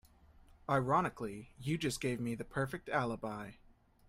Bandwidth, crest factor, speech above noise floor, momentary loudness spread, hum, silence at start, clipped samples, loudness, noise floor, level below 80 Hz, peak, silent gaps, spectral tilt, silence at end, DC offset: 16 kHz; 20 dB; 26 dB; 12 LU; none; 0.7 s; under 0.1%; -37 LUFS; -62 dBFS; -62 dBFS; -18 dBFS; none; -5.5 dB/octave; 0.55 s; under 0.1%